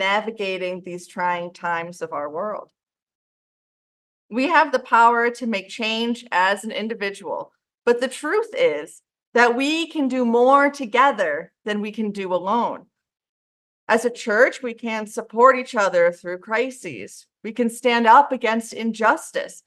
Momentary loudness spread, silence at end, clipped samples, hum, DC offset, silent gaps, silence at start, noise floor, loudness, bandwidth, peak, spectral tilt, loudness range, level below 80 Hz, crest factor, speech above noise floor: 15 LU; 0.05 s; under 0.1%; none; under 0.1%; 3.02-3.07 s, 3.15-4.29 s, 9.27-9.32 s, 13.29-13.87 s; 0 s; under -90 dBFS; -20 LUFS; 12.5 kHz; -2 dBFS; -4 dB/octave; 6 LU; -76 dBFS; 20 dB; over 69 dB